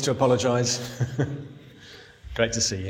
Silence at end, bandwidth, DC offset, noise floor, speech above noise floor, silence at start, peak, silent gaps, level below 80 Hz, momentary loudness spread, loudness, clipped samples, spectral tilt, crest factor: 0 s; 16.5 kHz; under 0.1%; -47 dBFS; 23 dB; 0 s; -6 dBFS; none; -50 dBFS; 24 LU; -24 LUFS; under 0.1%; -4 dB/octave; 20 dB